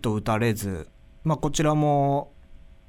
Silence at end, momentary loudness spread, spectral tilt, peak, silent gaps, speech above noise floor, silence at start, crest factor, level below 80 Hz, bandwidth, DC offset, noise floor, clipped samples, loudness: 0.3 s; 11 LU; -6 dB/octave; -10 dBFS; none; 24 dB; 0 s; 14 dB; -44 dBFS; 16.5 kHz; under 0.1%; -47 dBFS; under 0.1%; -25 LUFS